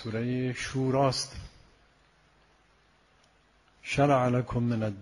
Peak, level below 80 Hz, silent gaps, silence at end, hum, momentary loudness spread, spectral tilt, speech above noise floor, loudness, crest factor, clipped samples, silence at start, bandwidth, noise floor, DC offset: -12 dBFS; -54 dBFS; none; 0 s; none; 11 LU; -6 dB/octave; 37 dB; -28 LUFS; 20 dB; under 0.1%; 0 s; 11.5 kHz; -64 dBFS; under 0.1%